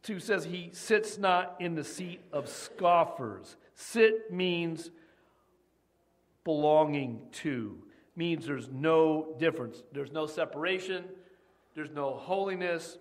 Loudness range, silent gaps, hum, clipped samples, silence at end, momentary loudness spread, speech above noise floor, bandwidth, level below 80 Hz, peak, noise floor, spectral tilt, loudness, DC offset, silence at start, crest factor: 3 LU; none; none; under 0.1%; 0 s; 15 LU; 41 dB; 15 kHz; -76 dBFS; -12 dBFS; -72 dBFS; -5 dB/octave; -31 LUFS; under 0.1%; 0.05 s; 20 dB